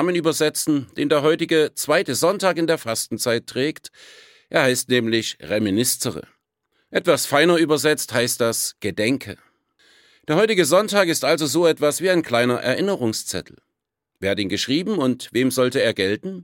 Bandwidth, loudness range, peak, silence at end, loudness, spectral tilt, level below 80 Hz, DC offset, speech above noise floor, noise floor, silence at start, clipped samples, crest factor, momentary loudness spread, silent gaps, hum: 17 kHz; 3 LU; -2 dBFS; 0 s; -20 LUFS; -3.5 dB/octave; -64 dBFS; under 0.1%; 59 dB; -79 dBFS; 0 s; under 0.1%; 18 dB; 8 LU; none; none